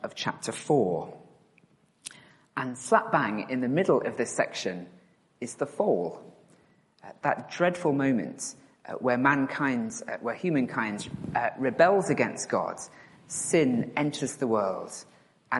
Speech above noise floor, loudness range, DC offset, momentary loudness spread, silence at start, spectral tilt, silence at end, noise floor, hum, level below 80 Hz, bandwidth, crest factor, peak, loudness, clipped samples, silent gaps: 36 dB; 4 LU; under 0.1%; 17 LU; 0 s; -5 dB/octave; 0 s; -64 dBFS; none; -70 dBFS; 11.5 kHz; 24 dB; -6 dBFS; -28 LUFS; under 0.1%; none